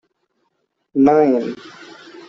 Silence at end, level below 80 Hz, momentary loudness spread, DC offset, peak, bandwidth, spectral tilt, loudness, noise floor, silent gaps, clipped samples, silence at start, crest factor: 0.1 s; -58 dBFS; 26 LU; under 0.1%; -2 dBFS; 7.2 kHz; -7.5 dB/octave; -16 LUFS; -70 dBFS; none; under 0.1%; 0.95 s; 16 dB